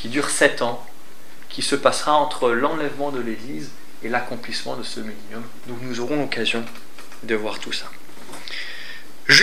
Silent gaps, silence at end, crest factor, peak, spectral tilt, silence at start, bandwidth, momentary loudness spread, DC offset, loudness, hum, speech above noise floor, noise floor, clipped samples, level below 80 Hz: none; 0 s; 24 dB; 0 dBFS; -2.5 dB/octave; 0 s; 16 kHz; 19 LU; 5%; -23 LUFS; none; 23 dB; -47 dBFS; under 0.1%; -68 dBFS